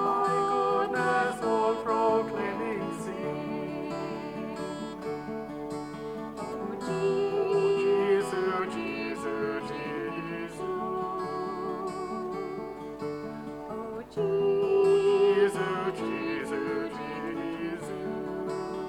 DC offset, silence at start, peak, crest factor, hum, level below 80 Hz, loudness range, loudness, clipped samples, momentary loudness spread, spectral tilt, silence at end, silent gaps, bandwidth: under 0.1%; 0 s; -14 dBFS; 16 dB; none; -60 dBFS; 8 LU; -30 LUFS; under 0.1%; 12 LU; -6 dB/octave; 0 s; none; 12.5 kHz